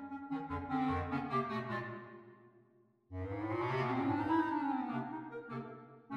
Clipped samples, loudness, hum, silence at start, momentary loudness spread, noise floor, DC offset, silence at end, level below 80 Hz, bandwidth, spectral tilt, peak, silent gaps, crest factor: under 0.1%; -38 LUFS; none; 0 s; 16 LU; -69 dBFS; under 0.1%; 0 s; -64 dBFS; 7 kHz; -8.5 dB/octave; -22 dBFS; none; 16 dB